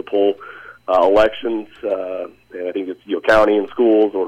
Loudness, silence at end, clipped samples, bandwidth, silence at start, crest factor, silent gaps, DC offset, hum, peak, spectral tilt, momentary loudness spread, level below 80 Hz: -17 LUFS; 0 s; under 0.1%; 10.5 kHz; 0.1 s; 12 dB; none; under 0.1%; none; -4 dBFS; -5.5 dB/octave; 16 LU; -44 dBFS